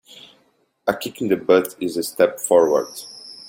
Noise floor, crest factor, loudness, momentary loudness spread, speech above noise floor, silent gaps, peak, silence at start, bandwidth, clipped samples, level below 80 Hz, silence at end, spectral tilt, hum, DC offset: -62 dBFS; 18 dB; -20 LUFS; 13 LU; 43 dB; none; -2 dBFS; 0.85 s; 17 kHz; under 0.1%; -64 dBFS; 0 s; -4 dB/octave; none; under 0.1%